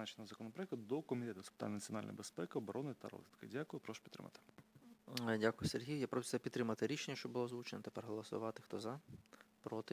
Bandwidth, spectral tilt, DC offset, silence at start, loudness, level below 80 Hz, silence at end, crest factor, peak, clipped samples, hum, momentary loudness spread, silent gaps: 16 kHz; -5 dB/octave; under 0.1%; 0 s; -45 LUFS; -76 dBFS; 0 s; 24 dB; -22 dBFS; under 0.1%; none; 16 LU; none